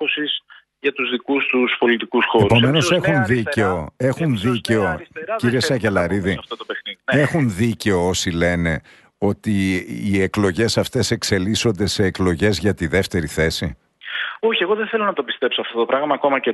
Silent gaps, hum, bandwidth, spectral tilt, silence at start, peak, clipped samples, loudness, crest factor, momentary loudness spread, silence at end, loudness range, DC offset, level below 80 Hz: none; none; 12.5 kHz; -5 dB/octave; 0 s; -2 dBFS; under 0.1%; -19 LUFS; 16 dB; 7 LU; 0 s; 3 LU; under 0.1%; -44 dBFS